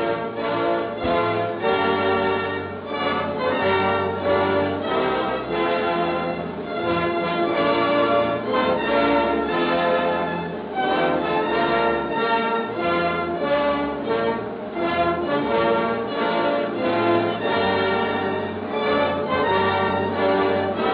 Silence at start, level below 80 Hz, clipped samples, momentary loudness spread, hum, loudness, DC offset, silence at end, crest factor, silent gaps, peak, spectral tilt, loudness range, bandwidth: 0 s; -52 dBFS; under 0.1%; 5 LU; none; -22 LUFS; under 0.1%; 0 s; 14 dB; none; -8 dBFS; -8.5 dB/octave; 2 LU; 5.2 kHz